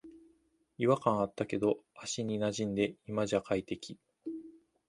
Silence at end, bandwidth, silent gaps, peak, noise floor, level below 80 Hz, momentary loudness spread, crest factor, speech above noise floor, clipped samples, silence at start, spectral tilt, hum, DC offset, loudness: 0.4 s; 11.5 kHz; none; -12 dBFS; -71 dBFS; -66 dBFS; 15 LU; 22 dB; 38 dB; under 0.1%; 0.05 s; -5.5 dB/octave; none; under 0.1%; -34 LUFS